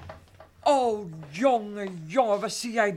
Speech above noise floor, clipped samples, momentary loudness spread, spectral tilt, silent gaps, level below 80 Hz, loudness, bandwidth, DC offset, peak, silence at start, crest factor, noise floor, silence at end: 25 dB; under 0.1%; 12 LU; -4.5 dB/octave; none; -62 dBFS; -26 LUFS; 15.5 kHz; under 0.1%; -8 dBFS; 0 s; 18 dB; -51 dBFS; 0 s